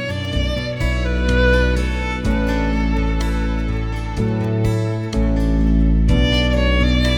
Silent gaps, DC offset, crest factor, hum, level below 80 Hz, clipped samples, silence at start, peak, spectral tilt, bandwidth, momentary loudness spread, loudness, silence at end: none; under 0.1%; 14 dB; none; -20 dBFS; under 0.1%; 0 s; -4 dBFS; -6.5 dB/octave; 10.5 kHz; 6 LU; -19 LUFS; 0 s